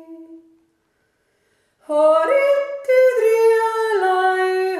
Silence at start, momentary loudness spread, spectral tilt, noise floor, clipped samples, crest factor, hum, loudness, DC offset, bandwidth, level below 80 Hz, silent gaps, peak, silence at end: 0.1 s; 4 LU; -2 dB/octave; -67 dBFS; under 0.1%; 12 dB; none; -17 LUFS; under 0.1%; 14.5 kHz; -74 dBFS; none; -6 dBFS; 0 s